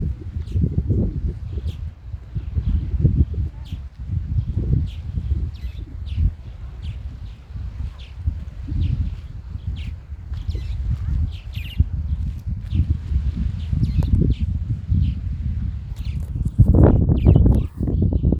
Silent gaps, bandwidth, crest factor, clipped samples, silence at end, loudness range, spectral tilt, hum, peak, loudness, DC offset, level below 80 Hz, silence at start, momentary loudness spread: none; 5.4 kHz; 20 dB; under 0.1%; 0 s; 10 LU; -10 dB/octave; none; 0 dBFS; -23 LUFS; under 0.1%; -26 dBFS; 0 s; 17 LU